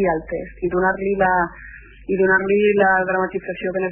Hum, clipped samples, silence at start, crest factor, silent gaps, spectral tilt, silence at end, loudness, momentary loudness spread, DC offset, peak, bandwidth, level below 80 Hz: none; under 0.1%; 0 s; 16 dB; none; -10.5 dB/octave; 0 s; -19 LUFS; 11 LU; under 0.1%; -2 dBFS; 3.3 kHz; -44 dBFS